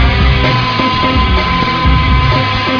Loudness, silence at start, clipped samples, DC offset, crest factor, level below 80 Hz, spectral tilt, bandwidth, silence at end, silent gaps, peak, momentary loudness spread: -11 LUFS; 0 s; under 0.1%; under 0.1%; 10 dB; -16 dBFS; -6.5 dB/octave; 5.4 kHz; 0 s; none; 0 dBFS; 2 LU